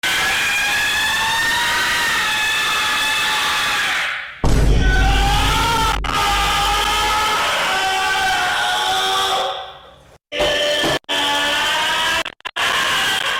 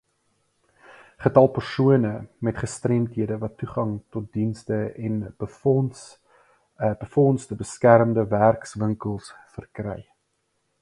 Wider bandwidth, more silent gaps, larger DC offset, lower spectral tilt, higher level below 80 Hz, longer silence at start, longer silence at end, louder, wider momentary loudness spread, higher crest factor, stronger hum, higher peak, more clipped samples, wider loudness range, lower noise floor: first, 17 kHz vs 11.5 kHz; neither; neither; second, -2 dB/octave vs -7.5 dB/octave; first, -26 dBFS vs -54 dBFS; second, 0.05 s vs 1.2 s; second, 0 s vs 0.8 s; first, -16 LUFS vs -23 LUFS; second, 3 LU vs 16 LU; second, 12 dB vs 24 dB; neither; second, -6 dBFS vs 0 dBFS; neither; second, 2 LU vs 6 LU; second, -45 dBFS vs -73 dBFS